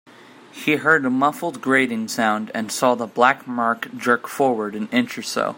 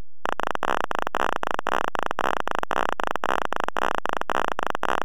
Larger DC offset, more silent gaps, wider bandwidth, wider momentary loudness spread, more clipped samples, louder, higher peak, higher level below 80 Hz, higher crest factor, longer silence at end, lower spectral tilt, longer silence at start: neither; neither; second, 16.5 kHz vs over 20 kHz; first, 8 LU vs 2 LU; neither; first, -20 LUFS vs -26 LUFS; first, -2 dBFS vs -6 dBFS; second, -68 dBFS vs -60 dBFS; about the same, 20 dB vs 20 dB; second, 0 s vs 0.65 s; about the same, -4 dB/octave vs -3.5 dB/octave; about the same, 0.55 s vs 0.65 s